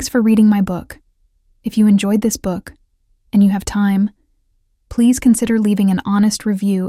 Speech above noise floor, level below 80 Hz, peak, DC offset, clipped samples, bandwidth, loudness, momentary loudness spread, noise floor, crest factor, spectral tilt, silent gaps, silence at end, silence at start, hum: 47 dB; -42 dBFS; -4 dBFS; under 0.1%; under 0.1%; 15 kHz; -15 LUFS; 10 LU; -61 dBFS; 12 dB; -6 dB/octave; none; 0 s; 0 s; none